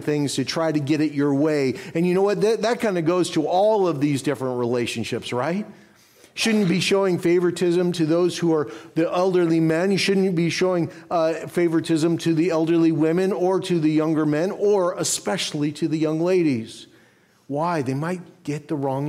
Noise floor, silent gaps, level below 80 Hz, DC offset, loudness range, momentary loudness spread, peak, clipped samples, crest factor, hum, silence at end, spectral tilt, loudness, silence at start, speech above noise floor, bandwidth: -57 dBFS; none; -66 dBFS; under 0.1%; 3 LU; 7 LU; -10 dBFS; under 0.1%; 12 dB; none; 0 s; -5.5 dB/octave; -22 LUFS; 0 s; 36 dB; 15 kHz